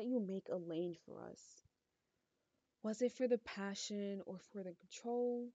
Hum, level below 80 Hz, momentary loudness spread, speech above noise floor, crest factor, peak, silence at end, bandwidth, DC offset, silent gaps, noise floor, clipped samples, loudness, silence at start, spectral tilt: none; -86 dBFS; 15 LU; 44 dB; 20 dB; -24 dBFS; 0.05 s; 8 kHz; under 0.1%; none; -87 dBFS; under 0.1%; -43 LUFS; 0 s; -5 dB/octave